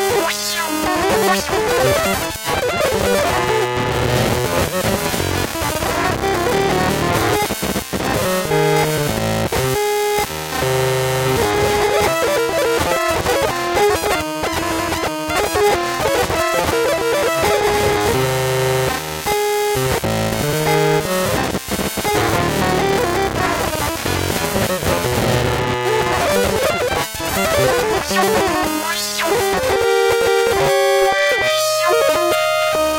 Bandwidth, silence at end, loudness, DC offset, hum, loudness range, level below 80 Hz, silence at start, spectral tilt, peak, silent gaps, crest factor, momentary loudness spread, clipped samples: 17.5 kHz; 0 s; -17 LUFS; under 0.1%; none; 2 LU; -36 dBFS; 0 s; -4 dB/octave; -2 dBFS; none; 14 dB; 4 LU; under 0.1%